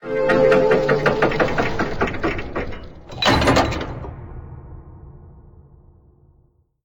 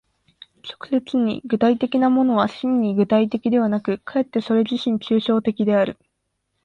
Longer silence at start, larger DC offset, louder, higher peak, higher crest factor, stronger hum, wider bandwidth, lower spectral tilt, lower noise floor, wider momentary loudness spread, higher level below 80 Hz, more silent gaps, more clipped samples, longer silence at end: second, 0 s vs 0.65 s; neither; about the same, -19 LUFS vs -20 LUFS; about the same, -4 dBFS vs -6 dBFS; about the same, 16 dB vs 16 dB; neither; first, 19 kHz vs 7 kHz; second, -5.5 dB/octave vs -7.5 dB/octave; second, -58 dBFS vs -74 dBFS; first, 23 LU vs 6 LU; first, -36 dBFS vs -62 dBFS; neither; neither; first, 1.45 s vs 0.7 s